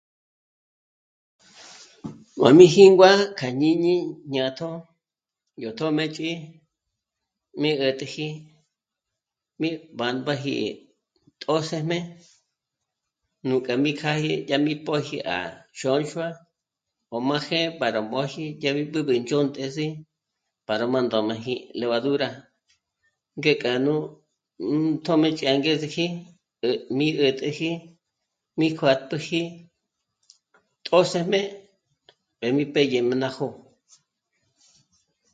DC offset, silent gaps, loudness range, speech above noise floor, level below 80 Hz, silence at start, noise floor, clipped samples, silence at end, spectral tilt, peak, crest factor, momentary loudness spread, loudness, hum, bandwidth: under 0.1%; none; 12 LU; 65 dB; -70 dBFS; 1.6 s; -87 dBFS; under 0.1%; 1.75 s; -5.5 dB/octave; 0 dBFS; 24 dB; 14 LU; -23 LUFS; none; 9.2 kHz